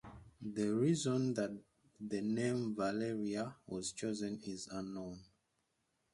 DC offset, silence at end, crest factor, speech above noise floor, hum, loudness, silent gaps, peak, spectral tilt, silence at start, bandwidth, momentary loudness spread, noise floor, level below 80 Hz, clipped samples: under 0.1%; 0.9 s; 18 dB; 44 dB; none; -39 LUFS; none; -22 dBFS; -5.5 dB/octave; 0.05 s; 11.5 kHz; 16 LU; -82 dBFS; -70 dBFS; under 0.1%